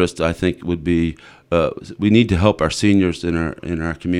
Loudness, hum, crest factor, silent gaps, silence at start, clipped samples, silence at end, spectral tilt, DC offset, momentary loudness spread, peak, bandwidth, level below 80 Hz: -19 LUFS; none; 18 dB; none; 0 s; under 0.1%; 0 s; -6.5 dB/octave; under 0.1%; 8 LU; 0 dBFS; 12 kHz; -36 dBFS